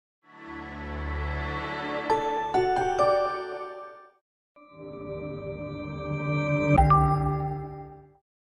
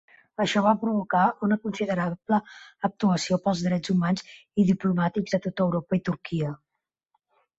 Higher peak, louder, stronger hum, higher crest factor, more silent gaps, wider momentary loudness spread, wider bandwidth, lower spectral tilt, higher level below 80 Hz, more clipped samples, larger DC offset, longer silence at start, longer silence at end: about the same, -8 dBFS vs -8 dBFS; about the same, -27 LUFS vs -26 LUFS; neither; about the same, 20 dB vs 18 dB; first, 4.21-4.55 s vs none; first, 21 LU vs 8 LU; first, 10.5 kHz vs 8 kHz; about the same, -7.5 dB/octave vs -6.5 dB/octave; first, -40 dBFS vs -62 dBFS; neither; neither; about the same, 0.35 s vs 0.4 s; second, 0.5 s vs 1.05 s